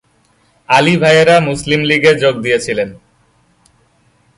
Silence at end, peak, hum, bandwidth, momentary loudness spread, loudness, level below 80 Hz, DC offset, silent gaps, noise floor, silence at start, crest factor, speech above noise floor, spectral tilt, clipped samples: 1.45 s; 0 dBFS; none; 11.5 kHz; 9 LU; -11 LUFS; -46 dBFS; under 0.1%; none; -55 dBFS; 0.7 s; 14 dB; 44 dB; -5 dB/octave; under 0.1%